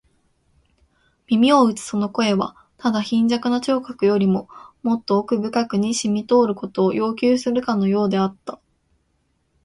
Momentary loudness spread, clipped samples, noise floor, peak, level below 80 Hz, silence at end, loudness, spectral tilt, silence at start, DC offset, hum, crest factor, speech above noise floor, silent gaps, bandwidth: 7 LU; under 0.1%; -67 dBFS; -4 dBFS; -60 dBFS; 1.1 s; -20 LUFS; -5.5 dB/octave; 1.3 s; under 0.1%; none; 16 dB; 48 dB; none; 11.5 kHz